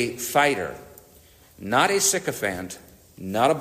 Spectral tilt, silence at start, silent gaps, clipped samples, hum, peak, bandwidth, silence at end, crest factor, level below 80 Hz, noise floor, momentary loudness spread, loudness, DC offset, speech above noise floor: -2.5 dB/octave; 0 s; none; under 0.1%; none; -6 dBFS; 15.5 kHz; 0 s; 20 dB; -58 dBFS; -53 dBFS; 20 LU; -23 LUFS; under 0.1%; 29 dB